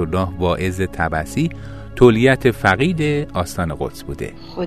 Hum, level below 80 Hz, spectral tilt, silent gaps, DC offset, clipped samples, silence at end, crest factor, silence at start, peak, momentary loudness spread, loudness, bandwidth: none; -36 dBFS; -6.5 dB/octave; none; 0.9%; under 0.1%; 0 s; 18 dB; 0 s; 0 dBFS; 16 LU; -18 LUFS; 14 kHz